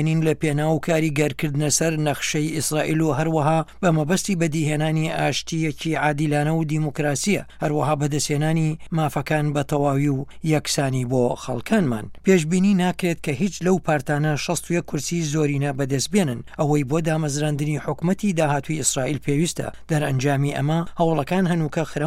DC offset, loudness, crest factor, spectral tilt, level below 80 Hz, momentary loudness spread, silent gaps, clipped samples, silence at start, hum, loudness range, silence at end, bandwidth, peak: under 0.1%; -22 LUFS; 16 dB; -5.5 dB/octave; -48 dBFS; 5 LU; none; under 0.1%; 0 s; none; 1 LU; 0 s; 15.5 kHz; -4 dBFS